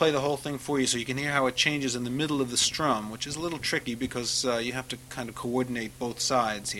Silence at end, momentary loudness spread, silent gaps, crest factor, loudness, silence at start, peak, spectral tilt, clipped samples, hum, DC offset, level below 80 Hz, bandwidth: 0 s; 9 LU; none; 20 dB; -28 LUFS; 0 s; -8 dBFS; -3 dB/octave; under 0.1%; none; under 0.1%; -56 dBFS; 16.5 kHz